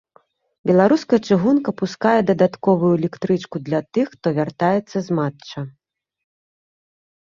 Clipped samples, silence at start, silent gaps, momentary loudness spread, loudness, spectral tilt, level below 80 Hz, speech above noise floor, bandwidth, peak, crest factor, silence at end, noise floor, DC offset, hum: under 0.1%; 0.65 s; none; 10 LU; -19 LUFS; -7.5 dB/octave; -60 dBFS; 39 dB; 7.4 kHz; -2 dBFS; 18 dB; 1.55 s; -58 dBFS; under 0.1%; none